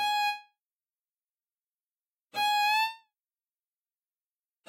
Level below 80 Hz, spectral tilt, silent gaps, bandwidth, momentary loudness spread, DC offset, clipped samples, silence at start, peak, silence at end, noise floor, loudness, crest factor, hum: -84 dBFS; 1.5 dB/octave; 0.75-0.89 s, 1.48-1.52 s, 1.80-1.84 s; 16 kHz; 13 LU; under 0.1%; under 0.1%; 0 s; -20 dBFS; 1.7 s; under -90 dBFS; -28 LUFS; 16 dB; none